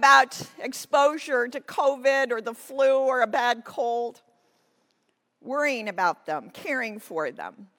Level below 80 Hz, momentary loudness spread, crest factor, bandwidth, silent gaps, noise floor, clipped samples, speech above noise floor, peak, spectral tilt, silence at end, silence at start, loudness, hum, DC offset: -84 dBFS; 12 LU; 20 dB; 17.5 kHz; none; -73 dBFS; under 0.1%; 48 dB; -4 dBFS; -2.5 dB/octave; 0.15 s; 0 s; -25 LUFS; none; under 0.1%